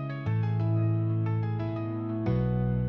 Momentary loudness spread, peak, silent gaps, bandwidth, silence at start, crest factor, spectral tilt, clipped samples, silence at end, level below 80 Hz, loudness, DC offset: 5 LU; -16 dBFS; none; 5.2 kHz; 0 s; 12 dB; -11 dB/octave; under 0.1%; 0 s; -46 dBFS; -29 LUFS; under 0.1%